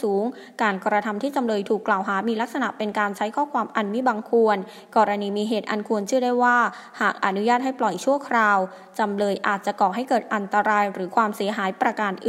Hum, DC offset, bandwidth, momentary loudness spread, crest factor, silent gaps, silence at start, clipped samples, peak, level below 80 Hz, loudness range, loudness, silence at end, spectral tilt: none; under 0.1%; 16 kHz; 6 LU; 18 dB; none; 0 s; under 0.1%; -4 dBFS; -78 dBFS; 2 LU; -23 LUFS; 0 s; -5 dB/octave